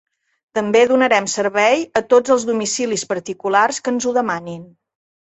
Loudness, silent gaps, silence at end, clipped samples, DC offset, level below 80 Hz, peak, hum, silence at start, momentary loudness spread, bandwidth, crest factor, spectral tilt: -17 LUFS; none; 0.65 s; under 0.1%; under 0.1%; -62 dBFS; -2 dBFS; none; 0.55 s; 10 LU; 8.2 kHz; 16 dB; -3 dB/octave